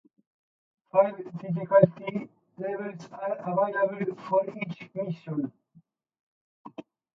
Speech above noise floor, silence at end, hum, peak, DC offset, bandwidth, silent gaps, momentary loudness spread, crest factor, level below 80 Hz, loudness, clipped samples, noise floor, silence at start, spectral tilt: 35 dB; 0.35 s; none; -4 dBFS; under 0.1%; 6.4 kHz; 6.20-6.65 s; 16 LU; 26 dB; -76 dBFS; -28 LUFS; under 0.1%; -62 dBFS; 0.95 s; -9 dB/octave